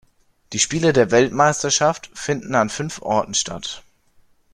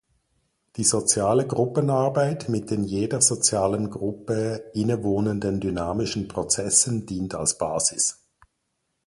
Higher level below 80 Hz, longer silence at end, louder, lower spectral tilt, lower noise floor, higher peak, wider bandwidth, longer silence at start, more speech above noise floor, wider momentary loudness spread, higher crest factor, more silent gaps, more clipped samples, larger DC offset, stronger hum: about the same, -52 dBFS vs -50 dBFS; second, 0.75 s vs 0.95 s; first, -19 LUFS vs -23 LUFS; about the same, -3.5 dB/octave vs -4 dB/octave; second, -56 dBFS vs -76 dBFS; about the same, -2 dBFS vs -4 dBFS; about the same, 12 kHz vs 11.5 kHz; second, 0.5 s vs 0.75 s; second, 37 dB vs 52 dB; first, 13 LU vs 9 LU; about the same, 18 dB vs 20 dB; neither; neither; neither; neither